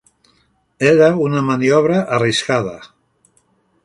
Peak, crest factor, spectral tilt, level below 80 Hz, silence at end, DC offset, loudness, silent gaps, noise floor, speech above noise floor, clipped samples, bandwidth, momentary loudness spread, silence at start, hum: 0 dBFS; 16 dB; -5.5 dB/octave; -56 dBFS; 1 s; under 0.1%; -15 LUFS; none; -60 dBFS; 45 dB; under 0.1%; 11.5 kHz; 8 LU; 0.8 s; none